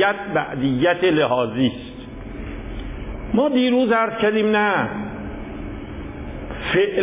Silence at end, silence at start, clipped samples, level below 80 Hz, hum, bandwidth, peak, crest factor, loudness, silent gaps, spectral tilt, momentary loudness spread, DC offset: 0 s; 0 s; under 0.1%; -38 dBFS; none; 3.9 kHz; -6 dBFS; 14 dB; -19 LUFS; none; -10 dB/octave; 16 LU; under 0.1%